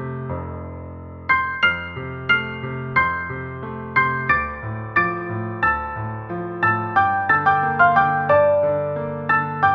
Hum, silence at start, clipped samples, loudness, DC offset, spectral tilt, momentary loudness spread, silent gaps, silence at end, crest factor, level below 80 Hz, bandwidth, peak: none; 0 s; under 0.1%; -20 LUFS; under 0.1%; -8 dB/octave; 14 LU; none; 0 s; 18 dB; -46 dBFS; 6.2 kHz; -2 dBFS